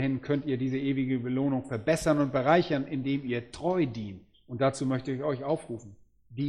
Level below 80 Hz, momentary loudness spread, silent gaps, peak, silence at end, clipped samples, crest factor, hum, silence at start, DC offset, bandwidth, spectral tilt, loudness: -58 dBFS; 15 LU; none; -10 dBFS; 0 s; under 0.1%; 20 dB; none; 0 s; under 0.1%; 13 kHz; -6.5 dB/octave; -29 LUFS